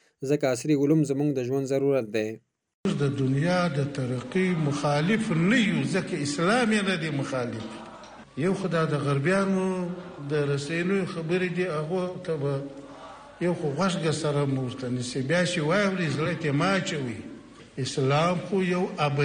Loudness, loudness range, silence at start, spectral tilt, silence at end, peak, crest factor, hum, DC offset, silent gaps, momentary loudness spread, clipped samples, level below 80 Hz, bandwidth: -26 LUFS; 4 LU; 0.2 s; -6 dB/octave; 0 s; -12 dBFS; 14 dB; none; under 0.1%; 2.74-2.84 s; 11 LU; under 0.1%; -62 dBFS; 17 kHz